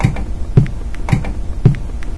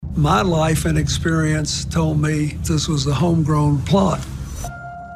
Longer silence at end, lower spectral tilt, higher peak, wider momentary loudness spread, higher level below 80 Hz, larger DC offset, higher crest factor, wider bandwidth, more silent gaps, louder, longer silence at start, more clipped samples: about the same, 0 s vs 0 s; first, -8 dB/octave vs -5.5 dB/octave; first, 0 dBFS vs -4 dBFS; second, 10 LU vs 13 LU; first, -22 dBFS vs -32 dBFS; neither; about the same, 16 dB vs 14 dB; second, 11 kHz vs 14.5 kHz; neither; about the same, -18 LUFS vs -18 LUFS; about the same, 0 s vs 0 s; first, 0.3% vs under 0.1%